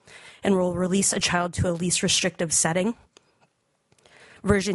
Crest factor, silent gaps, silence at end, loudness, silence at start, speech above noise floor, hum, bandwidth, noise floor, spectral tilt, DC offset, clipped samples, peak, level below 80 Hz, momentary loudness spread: 20 dB; none; 0 s; -23 LUFS; 0.1 s; 44 dB; none; 11.5 kHz; -68 dBFS; -3.5 dB/octave; under 0.1%; under 0.1%; -6 dBFS; -50 dBFS; 8 LU